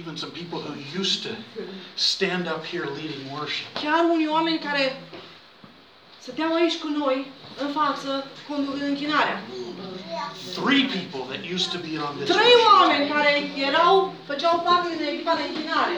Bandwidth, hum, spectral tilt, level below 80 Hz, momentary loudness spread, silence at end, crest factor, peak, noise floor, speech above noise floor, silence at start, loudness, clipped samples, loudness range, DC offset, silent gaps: over 20 kHz; none; -4 dB/octave; -72 dBFS; 15 LU; 0 s; 20 dB; -4 dBFS; -50 dBFS; 27 dB; 0 s; -23 LUFS; under 0.1%; 8 LU; under 0.1%; none